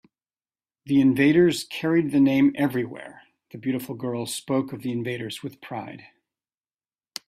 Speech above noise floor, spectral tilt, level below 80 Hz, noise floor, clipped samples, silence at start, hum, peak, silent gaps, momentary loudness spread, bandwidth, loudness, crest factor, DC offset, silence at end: over 67 dB; -6 dB/octave; -64 dBFS; under -90 dBFS; under 0.1%; 0.85 s; none; -8 dBFS; none; 17 LU; 15 kHz; -23 LUFS; 18 dB; under 0.1%; 1.3 s